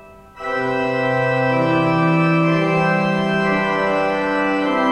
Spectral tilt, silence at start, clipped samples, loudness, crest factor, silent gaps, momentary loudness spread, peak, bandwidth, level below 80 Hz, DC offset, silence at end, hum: -7.5 dB/octave; 0 s; under 0.1%; -18 LUFS; 12 dB; none; 4 LU; -6 dBFS; 10.5 kHz; -50 dBFS; under 0.1%; 0 s; none